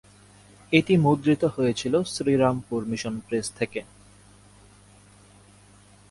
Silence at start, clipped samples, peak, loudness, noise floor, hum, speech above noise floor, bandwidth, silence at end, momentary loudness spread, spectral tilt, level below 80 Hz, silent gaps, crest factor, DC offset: 0.7 s; under 0.1%; -4 dBFS; -24 LUFS; -53 dBFS; 50 Hz at -50 dBFS; 30 dB; 11.5 kHz; 2.25 s; 10 LU; -6 dB/octave; -58 dBFS; none; 22 dB; under 0.1%